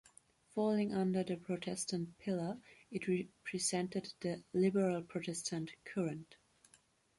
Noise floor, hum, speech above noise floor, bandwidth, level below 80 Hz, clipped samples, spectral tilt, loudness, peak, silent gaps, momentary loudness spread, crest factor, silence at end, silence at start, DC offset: -71 dBFS; none; 33 dB; 11.5 kHz; -76 dBFS; under 0.1%; -5 dB/octave; -38 LUFS; -22 dBFS; none; 9 LU; 16 dB; 0.85 s; 0.55 s; under 0.1%